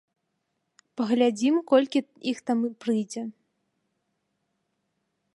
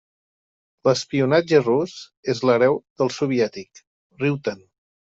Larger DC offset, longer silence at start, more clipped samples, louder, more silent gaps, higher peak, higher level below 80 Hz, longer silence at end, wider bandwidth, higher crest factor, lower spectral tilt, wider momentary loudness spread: neither; about the same, 0.95 s vs 0.85 s; neither; second, -25 LUFS vs -21 LUFS; second, none vs 2.17-2.23 s, 2.90-2.96 s, 3.87-4.10 s; second, -8 dBFS vs -4 dBFS; second, -80 dBFS vs -64 dBFS; first, 2.05 s vs 0.6 s; first, 11.5 kHz vs 8 kHz; about the same, 20 dB vs 18 dB; about the same, -5 dB/octave vs -6 dB/octave; about the same, 13 LU vs 13 LU